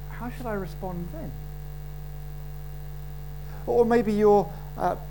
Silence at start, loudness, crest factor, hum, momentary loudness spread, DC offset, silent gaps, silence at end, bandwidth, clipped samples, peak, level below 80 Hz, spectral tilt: 0 s; -26 LUFS; 20 dB; none; 19 LU; 0.8%; none; 0 s; 17.5 kHz; under 0.1%; -8 dBFS; -40 dBFS; -7.5 dB/octave